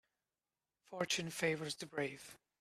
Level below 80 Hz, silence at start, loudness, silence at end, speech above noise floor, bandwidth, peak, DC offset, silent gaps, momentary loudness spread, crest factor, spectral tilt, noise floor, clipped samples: -80 dBFS; 0.9 s; -40 LUFS; 0.25 s; over 49 dB; 15 kHz; -20 dBFS; under 0.1%; none; 16 LU; 24 dB; -3 dB/octave; under -90 dBFS; under 0.1%